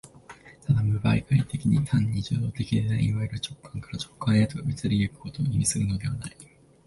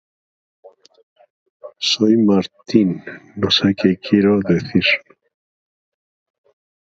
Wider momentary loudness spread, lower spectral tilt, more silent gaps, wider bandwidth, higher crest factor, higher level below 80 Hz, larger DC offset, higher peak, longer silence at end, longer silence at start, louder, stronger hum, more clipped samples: first, 12 LU vs 8 LU; about the same, -6 dB/octave vs -5.5 dB/octave; second, none vs 1.03-1.16 s, 1.30-1.60 s; first, 11.5 kHz vs 7.8 kHz; about the same, 16 dB vs 20 dB; first, -46 dBFS vs -52 dBFS; neither; second, -10 dBFS vs 0 dBFS; second, 0.4 s vs 1.95 s; second, 0.3 s vs 0.65 s; second, -26 LUFS vs -16 LUFS; neither; neither